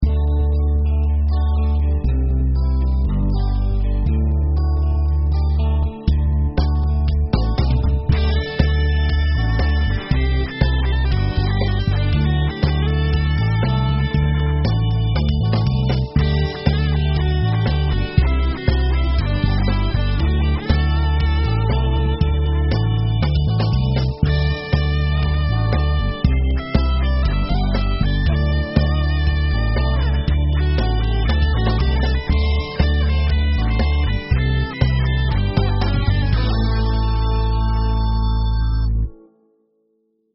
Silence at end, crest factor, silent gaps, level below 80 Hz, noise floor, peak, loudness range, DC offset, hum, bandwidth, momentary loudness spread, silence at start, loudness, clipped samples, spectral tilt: 1.2 s; 16 dB; none; -18 dBFS; -65 dBFS; 0 dBFS; 1 LU; under 0.1%; none; 5.8 kHz; 2 LU; 0 s; -19 LUFS; under 0.1%; -6 dB/octave